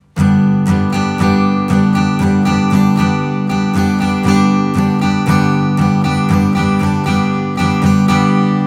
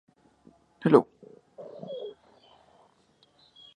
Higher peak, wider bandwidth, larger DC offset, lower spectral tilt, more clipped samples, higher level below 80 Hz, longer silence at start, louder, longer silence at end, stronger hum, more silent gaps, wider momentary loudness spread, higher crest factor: about the same, 0 dBFS vs -2 dBFS; first, 13 kHz vs 9.6 kHz; neither; second, -7 dB/octave vs -8.5 dB/octave; neither; first, -42 dBFS vs -76 dBFS; second, 0.15 s vs 0.85 s; first, -13 LUFS vs -26 LUFS; second, 0 s vs 1.7 s; neither; neither; second, 3 LU vs 24 LU; second, 12 dB vs 28 dB